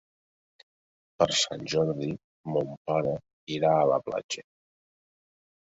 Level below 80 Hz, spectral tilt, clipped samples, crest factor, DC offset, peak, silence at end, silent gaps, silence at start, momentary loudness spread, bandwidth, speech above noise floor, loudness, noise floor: -64 dBFS; -4 dB/octave; under 0.1%; 22 dB; under 0.1%; -8 dBFS; 1.25 s; 2.24-2.44 s, 2.77-2.85 s, 3.33-3.47 s, 4.24-4.29 s; 1.2 s; 13 LU; 8 kHz; over 63 dB; -28 LUFS; under -90 dBFS